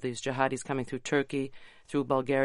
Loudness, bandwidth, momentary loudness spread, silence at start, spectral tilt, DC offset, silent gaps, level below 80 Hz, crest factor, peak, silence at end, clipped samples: -31 LUFS; 11.5 kHz; 6 LU; 0 s; -5 dB/octave; under 0.1%; none; -64 dBFS; 20 dB; -12 dBFS; 0 s; under 0.1%